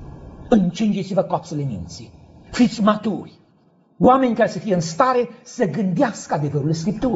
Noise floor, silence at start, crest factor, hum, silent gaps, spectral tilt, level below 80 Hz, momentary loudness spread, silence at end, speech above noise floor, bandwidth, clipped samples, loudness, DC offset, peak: -57 dBFS; 0 s; 18 dB; none; none; -6.5 dB/octave; -48 dBFS; 14 LU; 0 s; 37 dB; 8 kHz; under 0.1%; -20 LUFS; under 0.1%; -2 dBFS